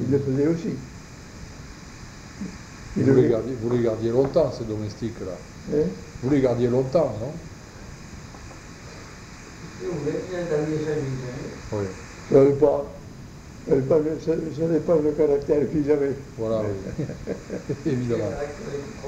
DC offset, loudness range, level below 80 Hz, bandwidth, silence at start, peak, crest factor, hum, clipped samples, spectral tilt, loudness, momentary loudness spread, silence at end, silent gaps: under 0.1%; 7 LU; -46 dBFS; 9.6 kHz; 0 s; -6 dBFS; 20 dB; none; under 0.1%; -7.5 dB/octave; -24 LUFS; 21 LU; 0 s; none